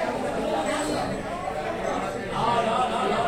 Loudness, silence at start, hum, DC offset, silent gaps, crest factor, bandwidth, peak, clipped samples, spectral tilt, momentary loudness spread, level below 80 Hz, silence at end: -26 LUFS; 0 s; none; under 0.1%; none; 14 dB; 16.5 kHz; -12 dBFS; under 0.1%; -4.5 dB/octave; 6 LU; -48 dBFS; 0 s